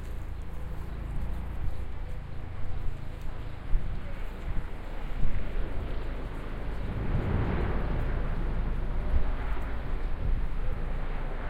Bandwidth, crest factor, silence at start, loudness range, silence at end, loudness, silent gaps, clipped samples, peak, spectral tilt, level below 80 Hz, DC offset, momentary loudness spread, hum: 4.8 kHz; 16 dB; 0 s; 6 LU; 0 s; -36 LUFS; none; under 0.1%; -12 dBFS; -8 dB/octave; -32 dBFS; under 0.1%; 9 LU; none